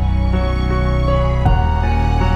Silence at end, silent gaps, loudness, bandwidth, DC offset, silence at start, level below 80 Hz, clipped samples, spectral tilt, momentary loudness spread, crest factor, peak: 0 s; none; -17 LUFS; 7 kHz; under 0.1%; 0 s; -18 dBFS; under 0.1%; -8 dB/octave; 2 LU; 12 dB; -2 dBFS